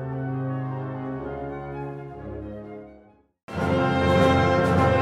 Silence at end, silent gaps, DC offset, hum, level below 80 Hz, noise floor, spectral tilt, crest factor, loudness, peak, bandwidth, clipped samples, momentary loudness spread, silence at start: 0 s; 3.43-3.48 s; under 0.1%; none; -44 dBFS; -54 dBFS; -7.5 dB/octave; 18 dB; -24 LUFS; -8 dBFS; 12.5 kHz; under 0.1%; 18 LU; 0 s